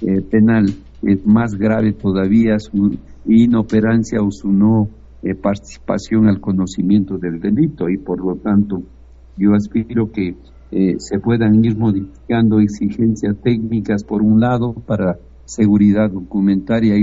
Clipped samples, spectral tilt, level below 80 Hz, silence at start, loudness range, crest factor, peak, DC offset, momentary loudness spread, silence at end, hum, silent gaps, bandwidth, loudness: under 0.1%; -8.5 dB/octave; -40 dBFS; 0 s; 3 LU; 14 dB; -2 dBFS; under 0.1%; 9 LU; 0 s; none; none; 7.8 kHz; -16 LUFS